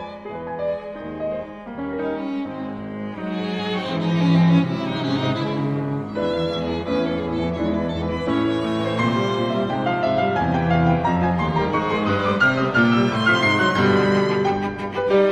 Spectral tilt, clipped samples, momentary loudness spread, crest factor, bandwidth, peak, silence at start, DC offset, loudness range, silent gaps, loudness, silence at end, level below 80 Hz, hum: -7 dB/octave; under 0.1%; 12 LU; 14 dB; 9 kHz; -6 dBFS; 0 s; under 0.1%; 8 LU; none; -21 LUFS; 0 s; -44 dBFS; none